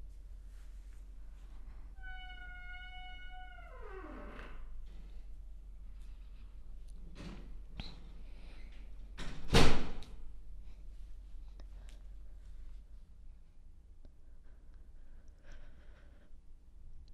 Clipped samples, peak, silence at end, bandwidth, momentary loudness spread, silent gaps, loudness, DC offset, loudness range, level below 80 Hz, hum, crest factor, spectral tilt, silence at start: under 0.1%; -10 dBFS; 0 s; 10.5 kHz; 13 LU; none; -42 LUFS; under 0.1%; 22 LU; -44 dBFS; none; 26 dB; -4.5 dB/octave; 0 s